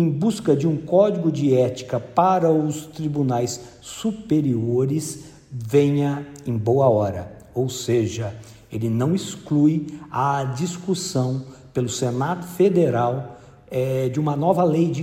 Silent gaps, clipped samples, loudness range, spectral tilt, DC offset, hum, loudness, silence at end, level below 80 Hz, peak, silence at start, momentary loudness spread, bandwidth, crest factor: none; under 0.1%; 3 LU; -7 dB/octave; under 0.1%; none; -22 LUFS; 0 s; -56 dBFS; -4 dBFS; 0 s; 12 LU; 16 kHz; 16 dB